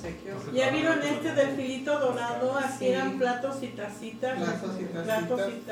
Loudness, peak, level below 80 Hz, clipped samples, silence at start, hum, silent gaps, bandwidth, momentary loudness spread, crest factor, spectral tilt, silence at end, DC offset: -29 LUFS; -12 dBFS; -62 dBFS; under 0.1%; 0 s; none; none; 18.5 kHz; 9 LU; 16 dB; -5 dB/octave; 0 s; under 0.1%